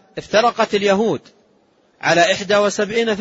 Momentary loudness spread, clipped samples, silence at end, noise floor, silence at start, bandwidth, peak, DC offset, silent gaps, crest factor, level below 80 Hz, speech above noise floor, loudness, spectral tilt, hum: 6 LU; under 0.1%; 0 s; -57 dBFS; 0.15 s; 8 kHz; -2 dBFS; under 0.1%; none; 16 dB; -58 dBFS; 40 dB; -17 LUFS; -3.5 dB/octave; none